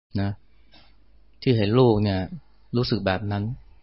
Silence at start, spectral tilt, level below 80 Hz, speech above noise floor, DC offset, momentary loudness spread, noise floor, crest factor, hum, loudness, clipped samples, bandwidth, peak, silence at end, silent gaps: 0.15 s; -10.5 dB/octave; -50 dBFS; 36 dB; 0.3%; 15 LU; -58 dBFS; 18 dB; none; -24 LUFS; under 0.1%; 5.8 kHz; -6 dBFS; 0.25 s; none